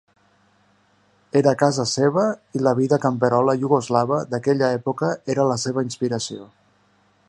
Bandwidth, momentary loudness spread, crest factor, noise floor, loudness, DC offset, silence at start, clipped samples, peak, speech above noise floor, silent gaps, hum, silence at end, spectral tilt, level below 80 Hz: 11.5 kHz; 6 LU; 20 dB; -60 dBFS; -21 LUFS; under 0.1%; 1.35 s; under 0.1%; -2 dBFS; 40 dB; none; 50 Hz at -55 dBFS; 0.85 s; -5.5 dB/octave; -64 dBFS